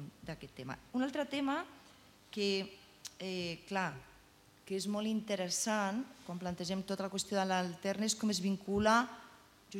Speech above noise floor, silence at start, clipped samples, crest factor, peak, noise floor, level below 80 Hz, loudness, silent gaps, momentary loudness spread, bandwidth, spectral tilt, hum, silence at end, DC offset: 27 dB; 0 s; under 0.1%; 22 dB; -16 dBFS; -63 dBFS; -68 dBFS; -36 LUFS; none; 14 LU; 16.5 kHz; -4 dB/octave; none; 0 s; under 0.1%